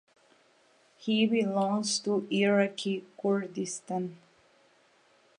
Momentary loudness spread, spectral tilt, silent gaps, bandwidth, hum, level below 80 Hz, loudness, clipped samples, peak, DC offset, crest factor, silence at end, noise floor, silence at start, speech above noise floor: 10 LU; -4.5 dB/octave; none; 11.5 kHz; none; -84 dBFS; -29 LUFS; under 0.1%; -14 dBFS; under 0.1%; 16 dB; 1.2 s; -65 dBFS; 1 s; 36 dB